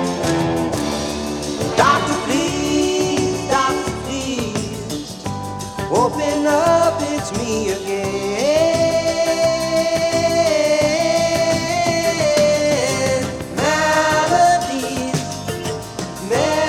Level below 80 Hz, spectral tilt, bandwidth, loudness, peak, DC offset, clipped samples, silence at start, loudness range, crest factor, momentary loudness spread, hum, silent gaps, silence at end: -42 dBFS; -4 dB/octave; 17 kHz; -18 LUFS; -2 dBFS; under 0.1%; under 0.1%; 0 s; 4 LU; 16 dB; 10 LU; none; none; 0 s